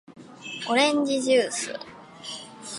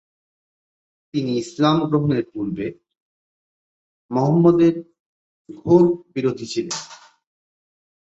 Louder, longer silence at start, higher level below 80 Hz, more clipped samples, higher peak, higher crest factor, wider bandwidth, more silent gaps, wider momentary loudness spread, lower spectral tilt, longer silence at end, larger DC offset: second, -23 LUFS vs -20 LUFS; second, 0.1 s vs 1.15 s; second, -74 dBFS vs -58 dBFS; neither; second, -8 dBFS vs -4 dBFS; about the same, 18 dB vs 18 dB; first, 11.5 kHz vs 8 kHz; second, none vs 3.00-4.09 s, 5.00-5.45 s; first, 19 LU vs 14 LU; second, -2 dB/octave vs -7 dB/octave; second, 0 s vs 1.25 s; neither